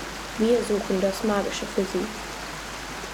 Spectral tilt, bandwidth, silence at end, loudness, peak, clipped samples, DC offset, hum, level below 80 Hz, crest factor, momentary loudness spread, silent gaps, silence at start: -4.5 dB/octave; 19.5 kHz; 0 s; -26 LUFS; -10 dBFS; under 0.1%; under 0.1%; none; -46 dBFS; 16 dB; 11 LU; none; 0 s